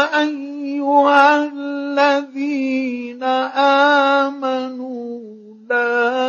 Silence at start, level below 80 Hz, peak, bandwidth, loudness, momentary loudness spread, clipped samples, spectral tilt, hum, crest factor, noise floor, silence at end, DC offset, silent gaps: 0 s; -80 dBFS; 0 dBFS; 7.4 kHz; -17 LUFS; 14 LU; under 0.1%; -3 dB/octave; none; 18 dB; -38 dBFS; 0 s; under 0.1%; none